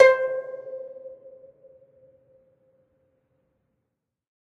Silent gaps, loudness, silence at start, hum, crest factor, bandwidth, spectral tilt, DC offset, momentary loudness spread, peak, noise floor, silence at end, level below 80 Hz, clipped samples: none; -25 LUFS; 0 s; none; 26 dB; 7.4 kHz; -2 dB/octave; under 0.1%; 25 LU; 0 dBFS; -81 dBFS; 3.35 s; -74 dBFS; under 0.1%